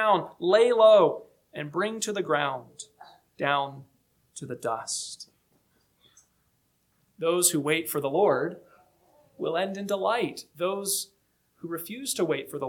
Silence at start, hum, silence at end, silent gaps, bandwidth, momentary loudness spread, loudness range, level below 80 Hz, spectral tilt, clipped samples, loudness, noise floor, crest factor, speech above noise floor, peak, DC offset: 0 s; none; 0 s; none; 19 kHz; 20 LU; 9 LU; -76 dBFS; -3 dB/octave; under 0.1%; -26 LUFS; -71 dBFS; 20 dB; 45 dB; -8 dBFS; under 0.1%